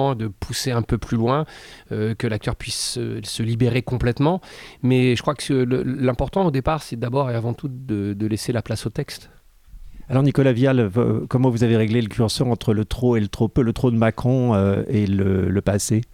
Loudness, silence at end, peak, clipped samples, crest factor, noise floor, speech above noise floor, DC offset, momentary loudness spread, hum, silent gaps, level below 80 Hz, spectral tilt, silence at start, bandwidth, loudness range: -21 LUFS; 0.1 s; -6 dBFS; under 0.1%; 16 dB; -42 dBFS; 22 dB; under 0.1%; 9 LU; none; none; -40 dBFS; -6.5 dB/octave; 0 s; 15.5 kHz; 5 LU